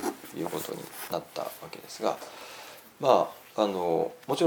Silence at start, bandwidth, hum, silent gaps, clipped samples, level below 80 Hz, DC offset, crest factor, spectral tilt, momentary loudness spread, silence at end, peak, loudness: 0 s; over 20 kHz; none; none; under 0.1%; -74 dBFS; under 0.1%; 24 dB; -4.5 dB/octave; 18 LU; 0 s; -6 dBFS; -30 LUFS